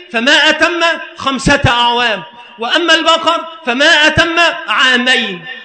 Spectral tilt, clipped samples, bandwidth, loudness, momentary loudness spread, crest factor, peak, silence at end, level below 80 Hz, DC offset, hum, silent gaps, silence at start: -3 dB/octave; under 0.1%; 9.2 kHz; -10 LUFS; 10 LU; 12 dB; 0 dBFS; 0 s; -36 dBFS; under 0.1%; none; none; 0 s